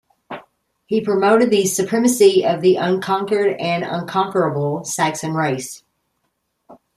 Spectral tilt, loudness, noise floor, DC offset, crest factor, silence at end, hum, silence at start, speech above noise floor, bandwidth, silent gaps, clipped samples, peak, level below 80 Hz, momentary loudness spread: -4.5 dB/octave; -18 LUFS; -71 dBFS; under 0.1%; 16 dB; 0.25 s; none; 0.3 s; 54 dB; 15.5 kHz; none; under 0.1%; -2 dBFS; -64 dBFS; 16 LU